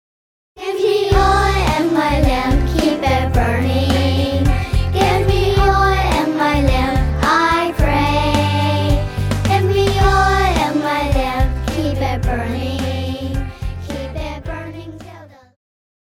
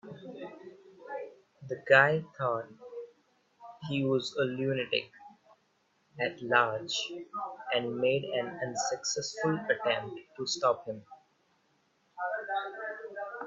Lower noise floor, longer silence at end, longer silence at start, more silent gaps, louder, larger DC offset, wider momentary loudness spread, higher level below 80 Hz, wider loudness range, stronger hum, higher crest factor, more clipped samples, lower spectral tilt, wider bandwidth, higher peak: second, -39 dBFS vs -72 dBFS; first, 0.8 s vs 0 s; first, 0.55 s vs 0.05 s; neither; first, -16 LUFS vs -31 LUFS; neither; second, 12 LU vs 19 LU; first, -22 dBFS vs -76 dBFS; about the same, 7 LU vs 5 LU; neither; second, 14 dB vs 26 dB; neither; first, -6 dB/octave vs -3.5 dB/octave; first, 16.5 kHz vs 7.8 kHz; first, -2 dBFS vs -6 dBFS